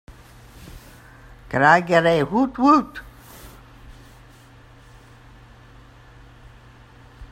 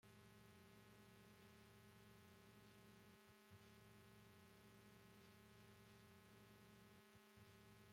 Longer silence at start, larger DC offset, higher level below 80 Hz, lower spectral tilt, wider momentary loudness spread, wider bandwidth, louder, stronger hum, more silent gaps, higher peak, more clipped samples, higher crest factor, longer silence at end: first, 0.6 s vs 0 s; neither; first, -48 dBFS vs -84 dBFS; first, -6 dB/octave vs -4.5 dB/octave; first, 28 LU vs 1 LU; about the same, 16 kHz vs 16.5 kHz; first, -17 LUFS vs -68 LUFS; neither; neither; first, -2 dBFS vs -54 dBFS; neither; first, 22 dB vs 14 dB; about the same, 0.05 s vs 0 s